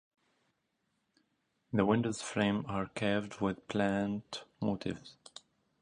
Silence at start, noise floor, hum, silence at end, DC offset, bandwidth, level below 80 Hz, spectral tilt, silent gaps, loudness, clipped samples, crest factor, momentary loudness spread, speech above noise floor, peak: 1.7 s; -81 dBFS; none; 0.7 s; under 0.1%; 10.5 kHz; -64 dBFS; -6 dB/octave; none; -34 LUFS; under 0.1%; 20 dB; 17 LU; 47 dB; -14 dBFS